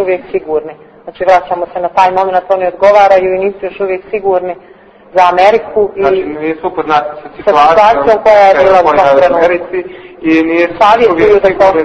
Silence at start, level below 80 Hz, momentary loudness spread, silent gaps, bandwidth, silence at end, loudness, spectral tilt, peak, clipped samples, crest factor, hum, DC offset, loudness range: 0 s; -42 dBFS; 11 LU; none; 8.6 kHz; 0 s; -9 LUFS; -5.5 dB/octave; 0 dBFS; 2%; 10 dB; none; under 0.1%; 4 LU